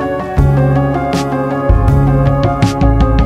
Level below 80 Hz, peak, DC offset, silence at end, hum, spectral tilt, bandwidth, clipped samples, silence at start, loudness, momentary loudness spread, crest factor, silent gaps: -18 dBFS; 0 dBFS; under 0.1%; 0 s; none; -8 dB/octave; 11 kHz; under 0.1%; 0 s; -13 LUFS; 4 LU; 10 dB; none